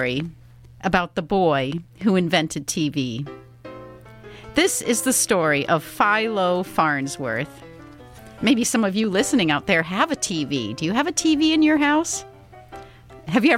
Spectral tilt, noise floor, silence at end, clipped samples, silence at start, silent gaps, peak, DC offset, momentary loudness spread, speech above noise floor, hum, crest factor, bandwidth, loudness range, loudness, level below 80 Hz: -4 dB/octave; -43 dBFS; 0 s; under 0.1%; 0 s; none; -4 dBFS; under 0.1%; 17 LU; 22 dB; none; 18 dB; 16.5 kHz; 3 LU; -21 LUFS; -52 dBFS